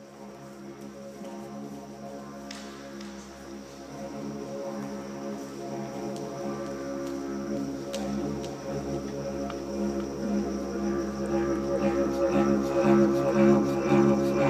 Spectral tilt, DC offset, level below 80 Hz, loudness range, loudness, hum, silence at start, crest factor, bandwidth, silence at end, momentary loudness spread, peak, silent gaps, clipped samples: -6.5 dB/octave; under 0.1%; -52 dBFS; 16 LU; -28 LUFS; none; 0 s; 20 dB; 15 kHz; 0 s; 20 LU; -10 dBFS; none; under 0.1%